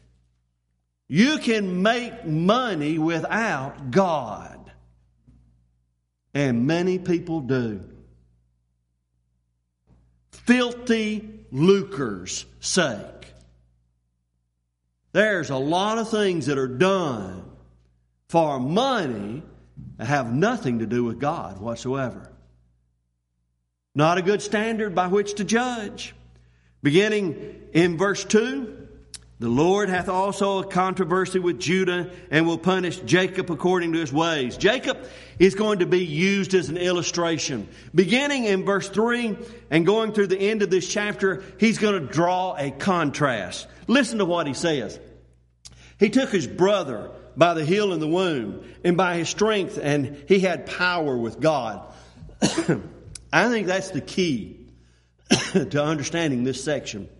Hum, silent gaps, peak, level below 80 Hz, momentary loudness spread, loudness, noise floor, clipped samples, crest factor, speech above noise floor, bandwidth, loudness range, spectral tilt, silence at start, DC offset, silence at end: none; none; -2 dBFS; -54 dBFS; 11 LU; -23 LUFS; -75 dBFS; under 0.1%; 22 dB; 52 dB; 11.5 kHz; 5 LU; -5 dB/octave; 1.1 s; under 0.1%; 0.1 s